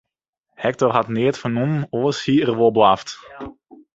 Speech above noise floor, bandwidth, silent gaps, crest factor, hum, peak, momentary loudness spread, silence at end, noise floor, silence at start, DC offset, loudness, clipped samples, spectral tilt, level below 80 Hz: 58 dB; 8 kHz; none; 18 dB; none; -2 dBFS; 19 LU; 0.45 s; -76 dBFS; 0.6 s; under 0.1%; -19 LUFS; under 0.1%; -6.5 dB/octave; -56 dBFS